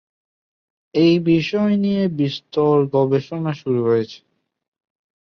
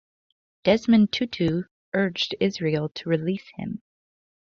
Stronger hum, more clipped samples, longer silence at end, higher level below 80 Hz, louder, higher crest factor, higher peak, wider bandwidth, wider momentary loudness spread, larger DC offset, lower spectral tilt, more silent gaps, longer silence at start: neither; neither; first, 1.05 s vs 0.75 s; about the same, -60 dBFS vs -58 dBFS; first, -19 LUFS vs -24 LUFS; about the same, 16 dB vs 18 dB; about the same, -4 dBFS vs -6 dBFS; about the same, 6.6 kHz vs 7 kHz; second, 8 LU vs 14 LU; neither; first, -8 dB/octave vs -6.5 dB/octave; second, none vs 1.71-1.92 s; first, 0.95 s vs 0.65 s